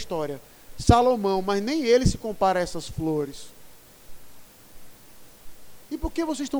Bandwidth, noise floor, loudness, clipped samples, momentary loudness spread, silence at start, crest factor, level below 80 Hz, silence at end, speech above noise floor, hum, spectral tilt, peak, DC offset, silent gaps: over 20 kHz; -48 dBFS; -24 LUFS; under 0.1%; 16 LU; 0 s; 24 dB; -40 dBFS; 0 s; 25 dB; none; -5.5 dB/octave; 0 dBFS; under 0.1%; none